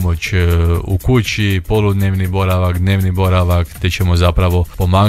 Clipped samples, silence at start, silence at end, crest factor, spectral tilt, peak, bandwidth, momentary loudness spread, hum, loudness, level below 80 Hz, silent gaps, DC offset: under 0.1%; 0 s; 0 s; 12 dB; -6.5 dB/octave; 0 dBFS; 15 kHz; 3 LU; none; -15 LUFS; -24 dBFS; none; under 0.1%